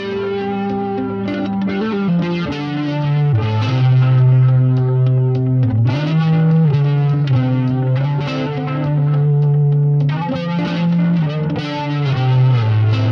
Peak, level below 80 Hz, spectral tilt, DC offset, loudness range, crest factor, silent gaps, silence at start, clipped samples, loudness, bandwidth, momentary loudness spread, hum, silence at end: -4 dBFS; -48 dBFS; -9.5 dB/octave; under 0.1%; 3 LU; 10 dB; none; 0 s; under 0.1%; -16 LUFS; 6 kHz; 7 LU; none; 0 s